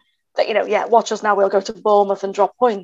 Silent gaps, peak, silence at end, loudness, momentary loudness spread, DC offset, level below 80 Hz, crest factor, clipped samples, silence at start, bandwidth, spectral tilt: none; 0 dBFS; 0 s; -18 LUFS; 4 LU; under 0.1%; -66 dBFS; 18 dB; under 0.1%; 0.35 s; 8 kHz; -4 dB/octave